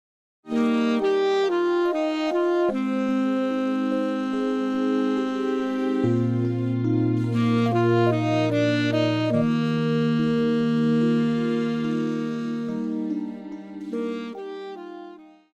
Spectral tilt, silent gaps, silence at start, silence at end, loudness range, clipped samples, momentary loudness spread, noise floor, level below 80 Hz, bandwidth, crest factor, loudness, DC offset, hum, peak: -7.5 dB/octave; none; 0.45 s; 0.3 s; 5 LU; under 0.1%; 10 LU; -44 dBFS; -66 dBFS; 8.4 kHz; 14 dB; -23 LUFS; under 0.1%; none; -8 dBFS